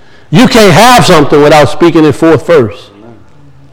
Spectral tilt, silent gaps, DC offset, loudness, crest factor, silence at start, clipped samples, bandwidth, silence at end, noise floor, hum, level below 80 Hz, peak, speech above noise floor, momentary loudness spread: -5 dB/octave; none; under 0.1%; -4 LUFS; 6 dB; 0.3 s; 10%; over 20 kHz; 0.9 s; -38 dBFS; none; -30 dBFS; 0 dBFS; 34 dB; 6 LU